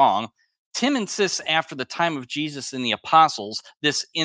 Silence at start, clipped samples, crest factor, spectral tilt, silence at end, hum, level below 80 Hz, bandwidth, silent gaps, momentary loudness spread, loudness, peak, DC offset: 0 s; under 0.1%; 20 dB; -3 dB/octave; 0 s; none; -76 dBFS; 10 kHz; 0.58-0.71 s; 13 LU; -23 LUFS; -4 dBFS; under 0.1%